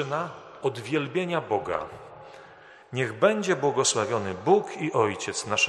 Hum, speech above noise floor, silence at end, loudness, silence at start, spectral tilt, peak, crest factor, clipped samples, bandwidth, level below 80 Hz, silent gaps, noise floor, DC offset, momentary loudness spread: none; 24 dB; 0 s; -26 LUFS; 0 s; -3.5 dB/octave; -6 dBFS; 22 dB; under 0.1%; 12 kHz; -66 dBFS; none; -50 dBFS; under 0.1%; 14 LU